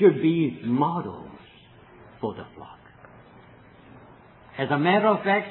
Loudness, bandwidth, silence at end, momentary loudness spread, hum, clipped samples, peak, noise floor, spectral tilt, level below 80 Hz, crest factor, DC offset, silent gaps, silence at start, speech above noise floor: -24 LUFS; 4.2 kHz; 0 s; 23 LU; none; under 0.1%; -6 dBFS; -51 dBFS; -10.5 dB/octave; -64 dBFS; 20 dB; under 0.1%; none; 0 s; 28 dB